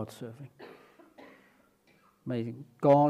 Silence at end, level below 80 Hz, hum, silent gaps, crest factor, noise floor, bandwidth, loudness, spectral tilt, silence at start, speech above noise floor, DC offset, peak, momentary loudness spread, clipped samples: 0 s; -80 dBFS; none; none; 20 dB; -65 dBFS; 13.5 kHz; -33 LUFS; -8.5 dB/octave; 0 s; 37 dB; under 0.1%; -10 dBFS; 25 LU; under 0.1%